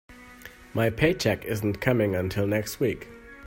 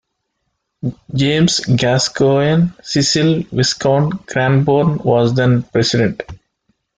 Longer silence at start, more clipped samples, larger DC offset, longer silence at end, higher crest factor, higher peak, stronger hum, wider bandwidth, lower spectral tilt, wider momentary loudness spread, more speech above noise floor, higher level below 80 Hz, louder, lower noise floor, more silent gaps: second, 0.1 s vs 0.85 s; neither; neither; second, 0 s vs 0.65 s; first, 20 dB vs 14 dB; second, -8 dBFS vs -2 dBFS; neither; first, 16.5 kHz vs 9.6 kHz; about the same, -6 dB/octave vs -5 dB/octave; first, 21 LU vs 7 LU; second, 22 dB vs 57 dB; about the same, -50 dBFS vs -46 dBFS; second, -26 LUFS vs -15 LUFS; second, -47 dBFS vs -71 dBFS; neither